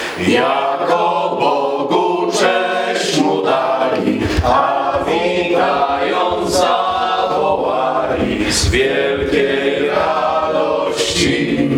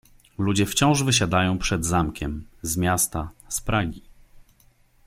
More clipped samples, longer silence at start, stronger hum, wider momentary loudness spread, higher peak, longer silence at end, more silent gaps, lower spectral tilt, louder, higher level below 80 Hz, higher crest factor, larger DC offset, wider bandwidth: neither; second, 0 s vs 0.4 s; neither; second, 2 LU vs 12 LU; first, -2 dBFS vs -6 dBFS; second, 0 s vs 0.65 s; neither; about the same, -4 dB/octave vs -4 dB/octave; first, -15 LUFS vs -23 LUFS; first, -34 dBFS vs -40 dBFS; second, 12 dB vs 18 dB; neither; about the same, 17.5 kHz vs 16.5 kHz